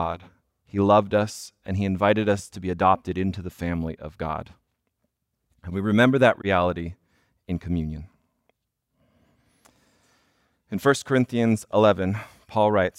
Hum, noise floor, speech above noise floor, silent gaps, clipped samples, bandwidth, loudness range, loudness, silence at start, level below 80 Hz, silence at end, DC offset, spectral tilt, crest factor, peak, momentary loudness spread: none; -76 dBFS; 54 dB; none; under 0.1%; 15.5 kHz; 12 LU; -24 LUFS; 0 s; -52 dBFS; 0.1 s; under 0.1%; -6.5 dB/octave; 20 dB; -4 dBFS; 14 LU